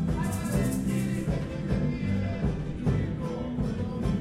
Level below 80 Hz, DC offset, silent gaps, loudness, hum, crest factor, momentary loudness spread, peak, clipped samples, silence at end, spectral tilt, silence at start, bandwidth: -38 dBFS; under 0.1%; none; -30 LUFS; none; 14 dB; 3 LU; -14 dBFS; under 0.1%; 0 s; -7 dB/octave; 0 s; 16 kHz